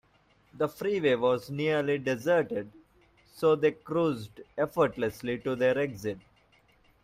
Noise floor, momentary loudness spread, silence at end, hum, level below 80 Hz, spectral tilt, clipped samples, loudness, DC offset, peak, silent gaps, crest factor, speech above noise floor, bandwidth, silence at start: -65 dBFS; 11 LU; 0.85 s; none; -64 dBFS; -6.5 dB/octave; under 0.1%; -29 LUFS; under 0.1%; -12 dBFS; none; 16 dB; 37 dB; 15.5 kHz; 0.55 s